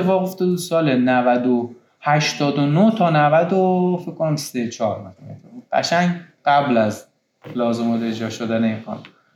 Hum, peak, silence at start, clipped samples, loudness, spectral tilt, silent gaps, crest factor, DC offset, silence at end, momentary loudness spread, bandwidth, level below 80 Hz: none; -4 dBFS; 0 s; under 0.1%; -19 LUFS; -6 dB/octave; none; 14 dB; under 0.1%; 0.3 s; 12 LU; 16.5 kHz; -72 dBFS